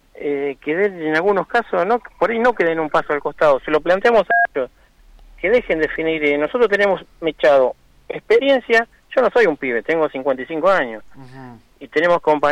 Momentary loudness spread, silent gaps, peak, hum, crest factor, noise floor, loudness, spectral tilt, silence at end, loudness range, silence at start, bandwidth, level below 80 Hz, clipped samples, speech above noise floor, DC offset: 8 LU; none; -6 dBFS; none; 12 dB; -46 dBFS; -18 LUFS; -5.5 dB/octave; 0 s; 2 LU; 0.2 s; 10 kHz; -50 dBFS; under 0.1%; 29 dB; under 0.1%